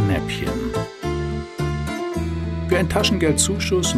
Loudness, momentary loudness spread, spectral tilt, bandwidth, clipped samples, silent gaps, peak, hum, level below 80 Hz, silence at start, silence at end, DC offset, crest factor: -22 LUFS; 8 LU; -4.5 dB/octave; 15 kHz; under 0.1%; none; -4 dBFS; none; -32 dBFS; 0 s; 0 s; under 0.1%; 18 dB